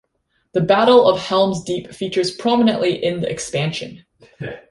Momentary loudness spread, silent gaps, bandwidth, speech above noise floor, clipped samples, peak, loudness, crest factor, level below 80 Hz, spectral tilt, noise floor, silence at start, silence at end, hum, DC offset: 17 LU; none; 11.5 kHz; 50 dB; under 0.1%; -2 dBFS; -17 LUFS; 16 dB; -54 dBFS; -5 dB/octave; -68 dBFS; 0.55 s; 0.1 s; none; under 0.1%